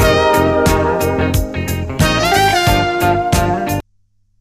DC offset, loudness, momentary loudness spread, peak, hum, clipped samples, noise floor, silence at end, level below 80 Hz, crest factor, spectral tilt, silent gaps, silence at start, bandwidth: under 0.1%; -14 LUFS; 9 LU; 0 dBFS; none; under 0.1%; -57 dBFS; 0.6 s; -26 dBFS; 14 dB; -5 dB/octave; none; 0 s; 15.5 kHz